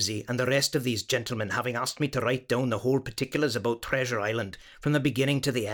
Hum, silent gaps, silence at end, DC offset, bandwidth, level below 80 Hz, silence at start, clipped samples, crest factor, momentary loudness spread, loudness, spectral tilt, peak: none; none; 0 s; under 0.1%; 19.5 kHz; -56 dBFS; 0 s; under 0.1%; 16 dB; 5 LU; -28 LUFS; -4.5 dB/octave; -12 dBFS